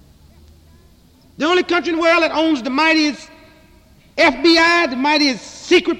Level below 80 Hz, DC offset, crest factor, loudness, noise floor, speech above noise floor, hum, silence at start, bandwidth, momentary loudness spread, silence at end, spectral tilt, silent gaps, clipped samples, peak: -50 dBFS; under 0.1%; 14 dB; -15 LUFS; -49 dBFS; 34 dB; none; 1.4 s; 11 kHz; 9 LU; 0 s; -2.5 dB/octave; none; under 0.1%; -2 dBFS